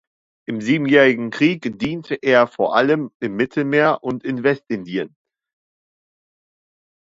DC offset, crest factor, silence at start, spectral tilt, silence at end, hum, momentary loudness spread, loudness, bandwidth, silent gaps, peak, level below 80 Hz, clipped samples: under 0.1%; 20 dB; 0.5 s; -6.5 dB/octave; 1.95 s; none; 12 LU; -19 LUFS; 7.8 kHz; 3.14-3.20 s; 0 dBFS; -62 dBFS; under 0.1%